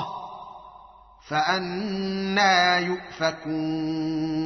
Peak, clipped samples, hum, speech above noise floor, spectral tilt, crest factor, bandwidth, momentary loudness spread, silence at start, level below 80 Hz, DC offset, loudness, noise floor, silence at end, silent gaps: -8 dBFS; under 0.1%; none; 26 dB; -2.5 dB/octave; 18 dB; 6.4 kHz; 19 LU; 0 s; -58 dBFS; under 0.1%; -24 LUFS; -50 dBFS; 0 s; none